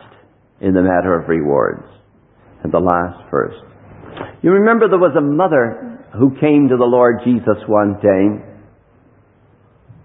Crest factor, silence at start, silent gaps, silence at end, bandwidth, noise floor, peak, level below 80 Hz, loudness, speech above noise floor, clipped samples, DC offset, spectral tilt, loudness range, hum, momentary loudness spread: 16 dB; 0.65 s; none; 1.55 s; 3.9 kHz; -51 dBFS; 0 dBFS; -44 dBFS; -14 LUFS; 37 dB; under 0.1%; under 0.1%; -12 dB/octave; 5 LU; none; 16 LU